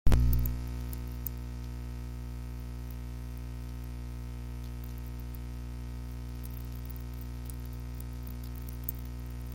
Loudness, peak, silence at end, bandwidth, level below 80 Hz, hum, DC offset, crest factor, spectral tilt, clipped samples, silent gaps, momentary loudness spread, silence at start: -39 LUFS; -10 dBFS; 0 s; 17 kHz; -36 dBFS; 60 Hz at -40 dBFS; under 0.1%; 24 dB; -6.5 dB/octave; under 0.1%; none; 5 LU; 0.05 s